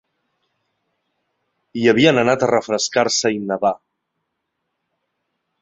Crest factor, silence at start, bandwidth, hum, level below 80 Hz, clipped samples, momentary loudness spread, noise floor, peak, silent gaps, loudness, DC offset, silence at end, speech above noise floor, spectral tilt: 20 dB; 1.75 s; 8.2 kHz; none; -60 dBFS; under 0.1%; 8 LU; -76 dBFS; -2 dBFS; none; -17 LUFS; under 0.1%; 1.85 s; 59 dB; -4 dB/octave